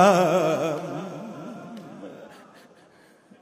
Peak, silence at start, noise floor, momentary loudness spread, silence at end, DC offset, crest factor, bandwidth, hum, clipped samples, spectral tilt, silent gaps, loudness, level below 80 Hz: -4 dBFS; 0 s; -55 dBFS; 22 LU; 1.1 s; under 0.1%; 22 dB; 16 kHz; none; under 0.1%; -5.5 dB/octave; none; -24 LUFS; -74 dBFS